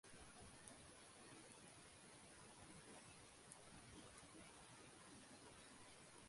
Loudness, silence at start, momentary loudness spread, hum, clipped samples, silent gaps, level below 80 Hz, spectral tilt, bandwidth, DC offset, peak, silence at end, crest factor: -62 LUFS; 0.05 s; 2 LU; none; under 0.1%; none; -78 dBFS; -3 dB/octave; 11.5 kHz; under 0.1%; -38 dBFS; 0 s; 26 dB